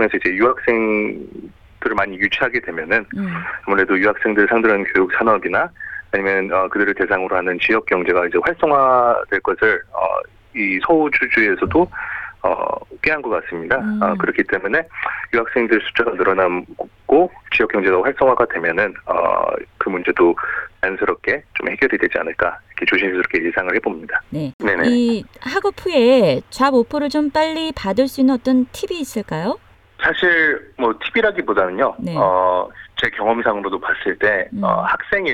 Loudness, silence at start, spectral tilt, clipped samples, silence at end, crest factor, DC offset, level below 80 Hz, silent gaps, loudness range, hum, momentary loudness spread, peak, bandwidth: -18 LUFS; 0 s; -5.5 dB/octave; under 0.1%; 0 s; 18 dB; under 0.1%; -48 dBFS; 24.54-24.59 s; 3 LU; none; 8 LU; 0 dBFS; 15 kHz